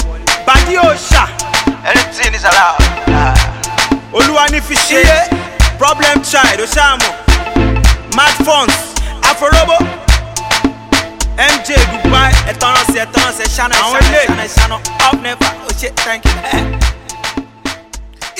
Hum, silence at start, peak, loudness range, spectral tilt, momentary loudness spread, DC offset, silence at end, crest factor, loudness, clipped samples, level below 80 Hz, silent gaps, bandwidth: none; 0 s; 0 dBFS; 2 LU; -3.5 dB/octave; 7 LU; under 0.1%; 0 s; 10 dB; -11 LUFS; 0.5%; -16 dBFS; none; 16.5 kHz